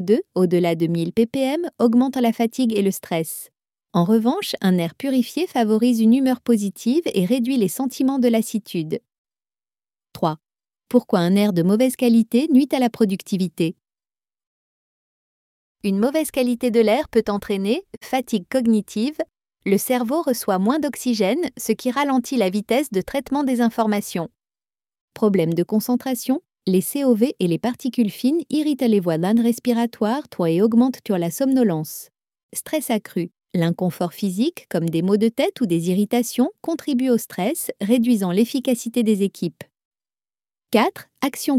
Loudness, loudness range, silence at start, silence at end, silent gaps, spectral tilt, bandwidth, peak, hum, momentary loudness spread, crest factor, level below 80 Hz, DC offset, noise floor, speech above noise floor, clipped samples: -21 LUFS; 4 LU; 0 s; 0 s; 9.18-9.25 s, 14.47-15.75 s, 25.01-25.08 s, 32.43-32.49 s, 39.85-39.91 s; -6 dB/octave; 16 kHz; -2 dBFS; none; 8 LU; 18 dB; -60 dBFS; under 0.1%; under -90 dBFS; over 70 dB; under 0.1%